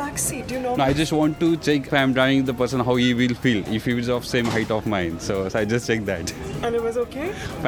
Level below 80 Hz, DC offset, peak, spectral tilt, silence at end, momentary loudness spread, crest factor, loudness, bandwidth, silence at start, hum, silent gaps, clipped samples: -44 dBFS; under 0.1%; -4 dBFS; -5 dB/octave; 0 s; 7 LU; 18 dB; -22 LUFS; 18.5 kHz; 0 s; none; none; under 0.1%